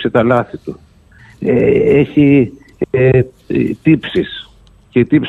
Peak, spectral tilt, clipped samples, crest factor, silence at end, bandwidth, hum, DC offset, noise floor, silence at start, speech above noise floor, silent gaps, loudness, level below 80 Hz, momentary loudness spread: 0 dBFS; -9 dB/octave; under 0.1%; 14 dB; 0 s; 4.5 kHz; none; under 0.1%; -43 dBFS; 0 s; 31 dB; none; -13 LUFS; -40 dBFS; 14 LU